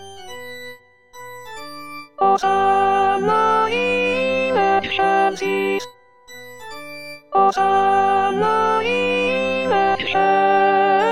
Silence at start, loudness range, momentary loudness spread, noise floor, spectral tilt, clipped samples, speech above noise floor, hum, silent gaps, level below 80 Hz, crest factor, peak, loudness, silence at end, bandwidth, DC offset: 0 s; 3 LU; 19 LU; -43 dBFS; -4.5 dB/octave; under 0.1%; 26 dB; none; none; -58 dBFS; 16 dB; -4 dBFS; -17 LUFS; 0 s; 15 kHz; 0.7%